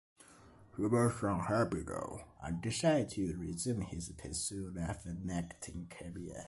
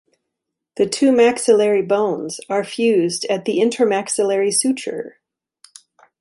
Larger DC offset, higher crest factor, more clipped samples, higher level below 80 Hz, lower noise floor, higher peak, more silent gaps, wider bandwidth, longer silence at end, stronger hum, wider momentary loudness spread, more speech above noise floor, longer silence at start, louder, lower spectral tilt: neither; about the same, 18 dB vs 16 dB; neither; first, -54 dBFS vs -66 dBFS; second, -60 dBFS vs -80 dBFS; second, -18 dBFS vs -2 dBFS; neither; about the same, 12 kHz vs 11.5 kHz; second, 0 s vs 1.1 s; neither; first, 14 LU vs 11 LU; second, 23 dB vs 63 dB; second, 0.2 s vs 0.75 s; second, -37 LUFS vs -18 LUFS; first, -5.5 dB/octave vs -3.5 dB/octave